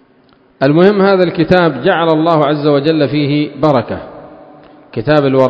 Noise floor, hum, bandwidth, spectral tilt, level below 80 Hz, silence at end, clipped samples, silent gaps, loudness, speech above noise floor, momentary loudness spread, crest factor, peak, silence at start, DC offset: -49 dBFS; none; 7.2 kHz; -8.5 dB/octave; -44 dBFS; 0 s; 0.3%; none; -12 LUFS; 38 dB; 11 LU; 12 dB; 0 dBFS; 0.6 s; under 0.1%